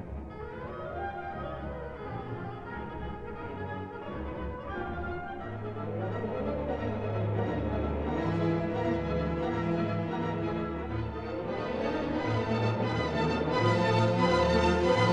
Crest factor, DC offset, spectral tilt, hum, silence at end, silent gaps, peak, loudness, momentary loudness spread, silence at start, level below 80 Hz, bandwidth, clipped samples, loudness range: 18 dB; under 0.1%; -7 dB/octave; none; 0 s; none; -12 dBFS; -32 LUFS; 14 LU; 0 s; -44 dBFS; 9.4 kHz; under 0.1%; 10 LU